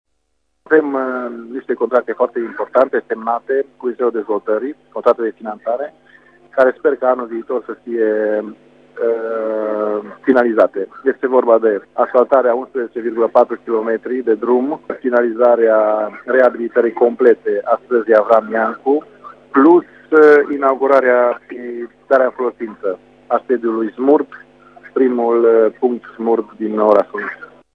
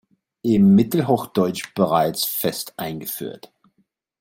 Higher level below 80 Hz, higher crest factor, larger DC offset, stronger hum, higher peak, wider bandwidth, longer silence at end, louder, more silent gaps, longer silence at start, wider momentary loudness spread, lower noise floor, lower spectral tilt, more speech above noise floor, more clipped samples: second, -66 dBFS vs -58 dBFS; about the same, 16 dB vs 16 dB; neither; first, 50 Hz at -65 dBFS vs none; first, 0 dBFS vs -4 dBFS; second, 5.4 kHz vs 17 kHz; second, 0.3 s vs 0.85 s; first, -16 LUFS vs -20 LUFS; neither; first, 0.7 s vs 0.45 s; about the same, 12 LU vs 14 LU; about the same, -70 dBFS vs -67 dBFS; first, -7.5 dB/octave vs -6 dB/octave; first, 55 dB vs 48 dB; neither